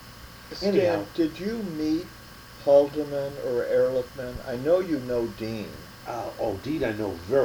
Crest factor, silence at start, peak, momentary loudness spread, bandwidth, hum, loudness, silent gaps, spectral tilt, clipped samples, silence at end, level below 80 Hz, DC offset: 20 dB; 0 s; -6 dBFS; 17 LU; over 20 kHz; none; -27 LUFS; none; -6.5 dB/octave; under 0.1%; 0 s; -50 dBFS; under 0.1%